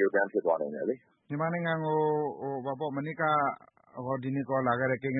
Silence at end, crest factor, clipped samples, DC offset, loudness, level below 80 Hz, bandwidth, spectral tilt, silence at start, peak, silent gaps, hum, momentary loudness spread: 0 s; 16 dB; under 0.1%; under 0.1%; -31 LUFS; -74 dBFS; 4 kHz; -11 dB/octave; 0 s; -14 dBFS; none; none; 9 LU